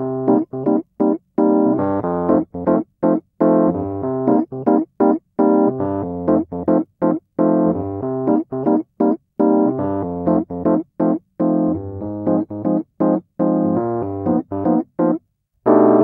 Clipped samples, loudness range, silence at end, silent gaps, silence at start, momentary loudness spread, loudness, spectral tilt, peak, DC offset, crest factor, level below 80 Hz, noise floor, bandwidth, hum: under 0.1%; 2 LU; 0 s; none; 0 s; 6 LU; -19 LUFS; -13.5 dB/octave; 0 dBFS; under 0.1%; 18 dB; -54 dBFS; -41 dBFS; 2.4 kHz; none